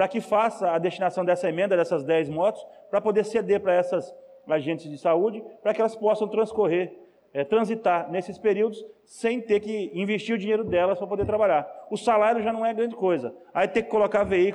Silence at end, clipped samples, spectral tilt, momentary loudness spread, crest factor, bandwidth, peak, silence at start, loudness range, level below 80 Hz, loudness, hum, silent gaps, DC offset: 0 s; under 0.1%; -6 dB/octave; 7 LU; 12 dB; 11 kHz; -12 dBFS; 0 s; 2 LU; -58 dBFS; -25 LUFS; none; none; under 0.1%